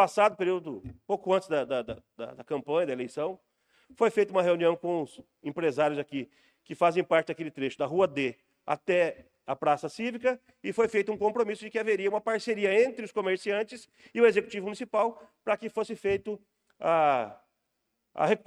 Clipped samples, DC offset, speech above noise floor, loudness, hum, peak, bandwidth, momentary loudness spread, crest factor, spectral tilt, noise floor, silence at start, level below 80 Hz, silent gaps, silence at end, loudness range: under 0.1%; under 0.1%; 52 dB; -29 LUFS; none; -10 dBFS; 11.5 kHz; 15 LU; 18 dB; -5.5 dB/octave; -80 dBFS; 0 s; -68 dBFS; none; 0.1 s; 2 LU